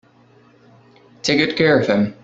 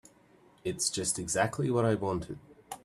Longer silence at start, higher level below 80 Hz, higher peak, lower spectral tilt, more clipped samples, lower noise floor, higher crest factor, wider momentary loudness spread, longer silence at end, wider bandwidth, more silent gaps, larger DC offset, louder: first, 1.25 s vs 0.65 s; about the same, -56 dBFS vs -60 dBFS; first, -2 dBFS vs -12 dBFS; about the same, -5 dB/octave vs -4 dB/octave; neither; second, -52 dBFS vs -61 dBFS; about the same, 18 dB vs 20 dB; second, 5 LU vs 16 LU; about the same, 0.1 s vs 0.05 s; second, 8 kHz vs 14.5 kHz; neither; neither; first, -17 LUFS vs -31 LUFS